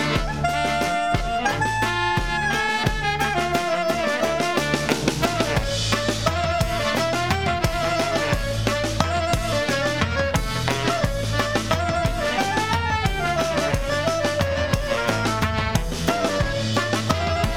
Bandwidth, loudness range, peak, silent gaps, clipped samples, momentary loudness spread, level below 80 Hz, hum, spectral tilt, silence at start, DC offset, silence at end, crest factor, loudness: 18 kHz; 1 LU; -4 dBFS; none; under 0.1%; 2 LU; -34 dBFS; none; -4.5 dB/octave; 0 s; 0.7%; 0 s; 20 dB; -22 LUFS